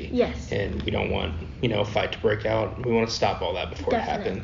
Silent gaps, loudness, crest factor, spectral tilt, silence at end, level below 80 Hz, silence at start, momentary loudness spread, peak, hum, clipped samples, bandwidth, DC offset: none; -26 LUFS; 16 dB; -4.5 dB/octave; 0 s; -42 dBFS; 0 s; 5 LU; -10 dBFS; none; under 0.1%; 7.4 kHz; under 0.1%